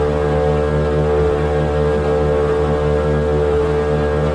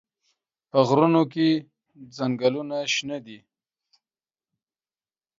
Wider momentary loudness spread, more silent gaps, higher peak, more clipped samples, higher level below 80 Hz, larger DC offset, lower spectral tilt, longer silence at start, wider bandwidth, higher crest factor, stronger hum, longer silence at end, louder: second, 1 LU vs 13 LU; neither; about the same, -6 dBFS vs -4 dBFS; neither; first, -24 dBFS vs -72 dBFS; neither; first, -8 dB/octave vs -5.5 dB/octave; second, 0 s vs 0.75 s; first, 10 kHz vs 7.6 kHz; second, 10 dB vs 22 dB; neither; second, 0 s vs 2 s; first, -17 LUFS vs -23 LUFS